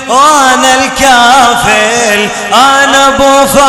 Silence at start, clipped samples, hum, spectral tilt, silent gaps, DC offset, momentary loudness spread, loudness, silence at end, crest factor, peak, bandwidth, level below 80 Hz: 0 s; 6%; none; -1.5 dB/octave; none; under 0.1%; 4 LU; -5 LUFS; 0 s; 6 dB; 0 dBFS; over 20 kHz; -34 dBFS